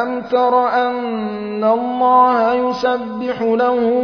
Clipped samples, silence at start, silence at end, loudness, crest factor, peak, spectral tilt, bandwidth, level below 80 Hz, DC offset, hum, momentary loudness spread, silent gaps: under 0.1%; 0 s; 0 s; -16 LUFS; 14 dB; -2 dBFS; -6.5 dB/octave; 5.4 kHz; -56 dBFS; under 0.1%; none; 10 LU; none